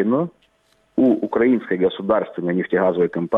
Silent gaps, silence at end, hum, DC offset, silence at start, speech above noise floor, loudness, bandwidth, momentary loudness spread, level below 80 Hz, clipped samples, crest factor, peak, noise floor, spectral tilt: none; 0 s; none; under 0.1%; 0 s; 43 dB; -20 LUFS; 4 kHz; 5 LU; -60 dBFS; under 0.1%; 14 dB; -6 dBFS; -62 dBFS; -9.5 dB/octave